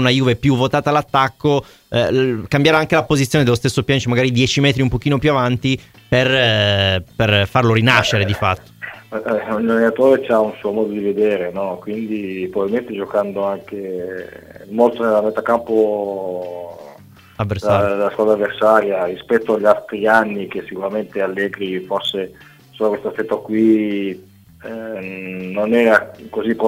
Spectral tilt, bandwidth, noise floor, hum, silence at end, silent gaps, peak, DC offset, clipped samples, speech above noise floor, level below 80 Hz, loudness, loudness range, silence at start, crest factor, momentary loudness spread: -5.5 dB/octave; 16 kHz; -43 dBFS; none; 0 s; none; 0 dBFS; under 0.1%; under 0.1%; 26 dB; -46 dBFS; -17 LUFS; 6 LU; 0 s; 18 dB; 13 LU